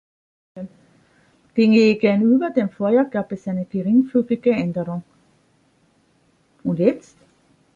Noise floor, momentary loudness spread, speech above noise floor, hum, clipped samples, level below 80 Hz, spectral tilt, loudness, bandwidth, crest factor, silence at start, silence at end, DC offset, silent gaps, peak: -61 dBFS; 18 LU; 43 dB; none; under 0.1%; -64 dBFS; -8 dB/octave; -19 LUFS; 7.4 kHz; 18 dB; 0.55 s; 0.75 s; under 0.1%; none; -2 dBFS